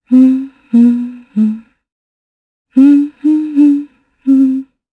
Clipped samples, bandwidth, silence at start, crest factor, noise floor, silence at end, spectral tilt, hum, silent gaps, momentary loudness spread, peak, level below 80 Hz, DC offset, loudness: under 0.1%; 4.1 kHz; 0.1 s; 12 dB; under -90 dBFS; 0.3 s; -8.5 dB/octave; none; 1.92-2.65 s; 11 LU; 0 dBFS; -64 dBFS; under 0.1%; -12 LUFS